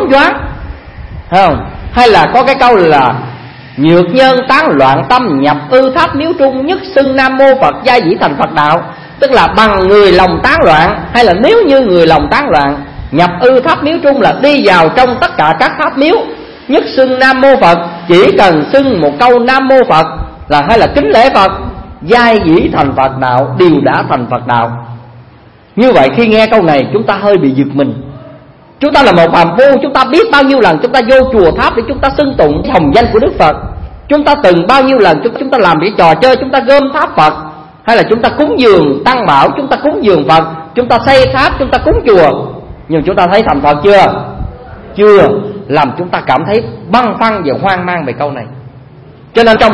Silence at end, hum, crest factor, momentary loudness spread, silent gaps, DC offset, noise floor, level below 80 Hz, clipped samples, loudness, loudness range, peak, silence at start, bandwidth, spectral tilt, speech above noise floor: 0 s; none; 8 dB; 10 LU; none; 0.5%; -38 dBFS; -30 dBFS; 2%; -7 LUFS; 3 LU; 0 dBFS; 0 s; 11 kHz; -6.5 dB/octave; 31 dB